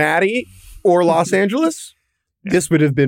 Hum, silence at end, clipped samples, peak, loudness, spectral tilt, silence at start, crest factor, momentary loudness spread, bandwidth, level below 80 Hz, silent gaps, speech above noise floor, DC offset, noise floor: none; 0 s; under 0.1%; -4 dBFS; -16 LUFS; -5.5 dB/octave; 0 s; 14 dB; 19 LU; 16.5 kHz; -50 dBFS; none; 32 dB; under 0.1%; -48 dBFS